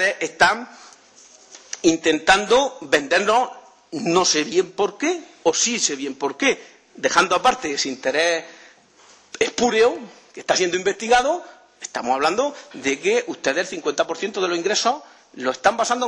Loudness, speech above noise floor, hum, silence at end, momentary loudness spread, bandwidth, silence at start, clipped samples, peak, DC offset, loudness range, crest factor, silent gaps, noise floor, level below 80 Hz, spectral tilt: -20 LUFS; 31 dB; none; 0 s; 11 LU; 11 kHz; 0 s; under 0.1%; -4 dBFS; under 0.1%; 3 LU; 18 dB; none; -52 dBFS; -56 dBFS; -2 dB/octave